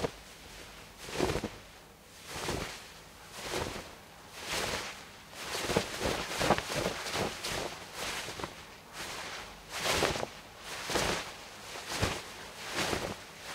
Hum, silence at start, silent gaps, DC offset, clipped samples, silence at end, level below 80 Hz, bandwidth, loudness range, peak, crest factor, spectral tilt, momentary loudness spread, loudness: none; 0 s; none; under 0.1%; under 0.1%; 0 s; -54 dBFS; 16 kHz; 5 LU; -10 dBFS; 28 dB; -3 dB/octave; 17 LU; -35 LUFS